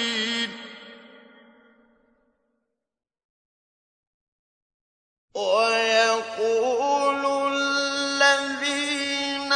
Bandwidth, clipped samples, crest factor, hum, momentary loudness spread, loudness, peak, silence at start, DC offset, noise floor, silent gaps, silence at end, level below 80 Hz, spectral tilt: 10.5 kHz; under 0.1%; 20 dB; none; 11 LU; -22 LUFS; -6 dBFS; 0 s; under 0.1%; -79 dBFS; 3.24-5.28 s; 0 s; -76 dBFS; -1 dB/octave